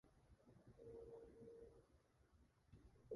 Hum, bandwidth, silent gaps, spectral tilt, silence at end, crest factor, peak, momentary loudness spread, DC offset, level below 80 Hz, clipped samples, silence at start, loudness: none; 11 kHz; none; -7.5 dB/octave; 0 s; 22 dB; -42 dBFS; 7 LU; under 0.1%; -76 dBFS; under 0.1%; 0.05 s; -63 LUFS